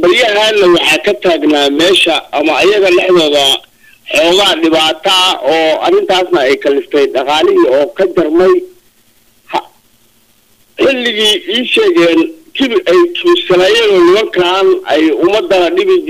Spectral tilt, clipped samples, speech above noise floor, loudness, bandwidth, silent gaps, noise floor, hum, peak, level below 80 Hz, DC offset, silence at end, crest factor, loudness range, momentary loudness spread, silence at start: -3 dB/octave; under 0.1%; 41 dB; -9 LUFS; 16 kHz; none; -50 dBFS; none; -2 dBFS; -48 dBFS; 0.4%; 0 s; 8 dB; 5 LU; 5 LU; 0 s